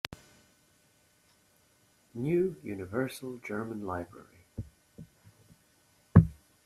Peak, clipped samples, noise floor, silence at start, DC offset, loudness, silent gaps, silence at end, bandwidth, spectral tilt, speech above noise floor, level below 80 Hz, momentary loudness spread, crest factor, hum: -4 dBFS; under 0.1%; -67 dBFS; 0.1 s; under 0.1%; -31 LUFS; none; 0.35 s; 13.5 kHz; -8 dB/octave; 33 dB; -52 dBFS; 27 LU; 28 dB; none